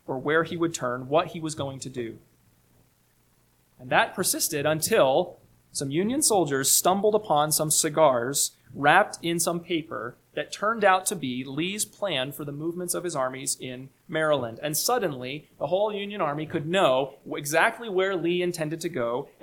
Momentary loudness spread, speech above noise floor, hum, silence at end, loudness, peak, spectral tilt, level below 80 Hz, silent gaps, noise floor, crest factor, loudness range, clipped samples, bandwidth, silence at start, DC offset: 12 LU; 39 dB; none; 0.15 s; -25 LUFS; -4 dBFS; -3 dB/octave; -64 dBFS; none; -64 dBFS; 22 dB; 7 LU; under 0.1%; 19 kHz; 0.1 s; under 0.1%